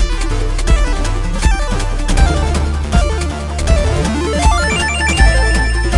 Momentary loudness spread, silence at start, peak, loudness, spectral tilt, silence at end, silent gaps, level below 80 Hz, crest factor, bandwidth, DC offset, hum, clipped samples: 7 LU; 0 s; 0 dBFS; -15 LUFS; -4.5 dB/octave; 0 s; none; -14 dBFS; 12 dB; 11.5 kHz; under 0.1%; none; under 0.1%